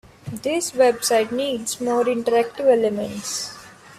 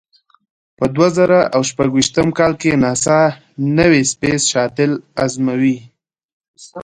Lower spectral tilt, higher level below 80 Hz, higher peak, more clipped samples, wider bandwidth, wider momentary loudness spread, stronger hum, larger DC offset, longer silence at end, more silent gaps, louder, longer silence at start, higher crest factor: second, -3 dB/octave vs -4.5 dB/octave; second, -62 dBFS vs -46 dBFS; second, -6 dBFS vs 0 dBFS; neither; first, 15.5 kHz vs 10.5 kHz; about the same, 10 LU vs 8 LU; neither; neither; about the same, 0.05 s vs 0 s; second, none vs 6.25-6.40 s, 6.48-6.54 s; second, -21 LUFS vs -15 LUFS; second, 0.25 s vs 0.8 s; about the same, 16 dB vs 16 dB